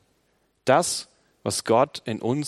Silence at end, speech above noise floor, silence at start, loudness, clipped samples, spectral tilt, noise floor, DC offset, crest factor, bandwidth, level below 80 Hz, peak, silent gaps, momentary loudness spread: 0 s; 45 dB; 0.65 s; -24 LUFS; under 0.1%; -4 dB/octave; -68 dBFS; under 0.1%; 22 dB; 13.5 kHz; -68 dBFS; -4 dBFS; none; 10 LU